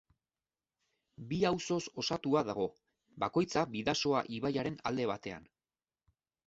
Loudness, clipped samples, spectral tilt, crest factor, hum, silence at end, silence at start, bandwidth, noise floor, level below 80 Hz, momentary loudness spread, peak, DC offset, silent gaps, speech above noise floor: -34 LUFS; under 0.1%; -4.5 dB/octave; 20 dB; none; 1.05 s; 1.2 s; 8 kHz; under -90 dBFS; -66 dBFS; 8 LU; -16 dBFS; under 0.1%; none; over 56 dB